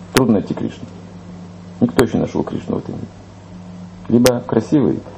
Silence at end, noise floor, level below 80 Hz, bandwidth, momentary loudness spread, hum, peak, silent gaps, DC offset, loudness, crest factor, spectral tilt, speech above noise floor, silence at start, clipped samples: 0 s; -36 dBFS; -44 dBFS; 13 kHz; 21 LU; none; 0 dBFS; none; under 0.1%; -17 LUFS; 18 dB; -6 dB/octave; 19 dB; 0 s; under 0.1%